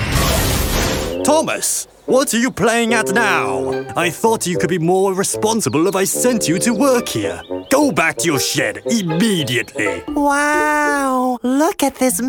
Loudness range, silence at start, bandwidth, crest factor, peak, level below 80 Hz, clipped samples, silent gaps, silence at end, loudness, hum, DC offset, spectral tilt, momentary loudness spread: 1 LU; 0 s; 19 kHz; 14 dB; -2 dBFS; -34 dBFS; under 0.1%; none; 0 s; -16 LUFS; none; under 0.1%; -4 dB/octave; 5 LU